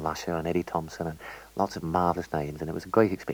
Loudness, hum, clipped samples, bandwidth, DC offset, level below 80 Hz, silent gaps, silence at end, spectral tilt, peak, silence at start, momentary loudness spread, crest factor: -29 LUFS; none; under 0.1%; over 20 kHz; under 0.1%; -52 dBFS; none; 0 s; -6.5 dB/octave; -6 dBFS; 0 s; 11 LU; 22 dB